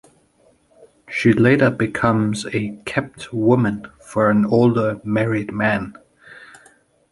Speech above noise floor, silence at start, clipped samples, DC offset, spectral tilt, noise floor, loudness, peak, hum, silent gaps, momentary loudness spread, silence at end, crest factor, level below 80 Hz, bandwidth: 40 dB; 1.1 s; under 0.1%; under 0.1%; -7 dB/octave; -58 dBFS; -19 LUFS; -2 dBFS; none; none; 10 LU; 0.75 s; 18 dB; -52 dBFS; 11.5 kHz